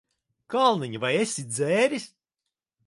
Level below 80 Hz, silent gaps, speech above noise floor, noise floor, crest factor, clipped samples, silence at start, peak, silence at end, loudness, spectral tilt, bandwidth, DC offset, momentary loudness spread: -76 dBFS; none; 62 dB; -86 dBFS; 20 dB; under 0.1%; 0.5 s; -8 dBFS; 0.8 s; -25 LUFS; -4 dB/octave; 11.5 kHz; under 0.1%; 9 LU